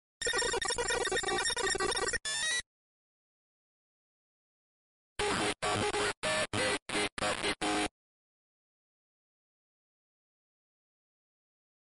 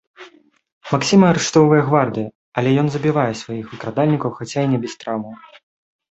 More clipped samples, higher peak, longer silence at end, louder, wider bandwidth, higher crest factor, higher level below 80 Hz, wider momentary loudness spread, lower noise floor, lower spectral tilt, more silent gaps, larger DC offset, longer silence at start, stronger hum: neither; second, -20 dBFS vs -2 dBFS; first, 4.1 s vs 0.75 s; second, -32 LUFS vs -18 LUFS; first, 11.5 kHz vs 8.2 kHz; about the same, 16 dB vs 16 dB; about the same, -56 dBFS vs -56 dBFS; second, 3 LU vs 14 LU; first, under -90 dBFS vs -48 dBFS; second, -2 dB/octave vs -6 dB/octave; first, 2.66-5.16 s, 6.17-6.22 s, 6.82-6.86 s, 7.12-7.17 s vs 0.72-0.81 s, 2.35-2.52 s; neither; about the same, 0.2 s vs 0.2 s; neither